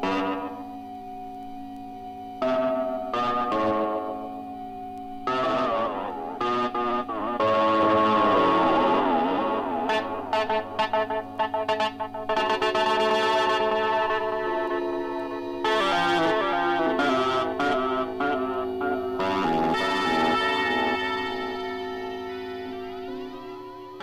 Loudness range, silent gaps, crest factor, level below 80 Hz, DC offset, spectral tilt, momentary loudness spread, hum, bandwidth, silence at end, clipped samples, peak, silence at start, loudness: 6 LU; none; 14 dB; -56 dBFS; under 0.1%; -5 dB/octave; 16 LU; none; 15 kHz; 0 s; under 0.1%; -10 dBFS; 0 s; -25 LUFS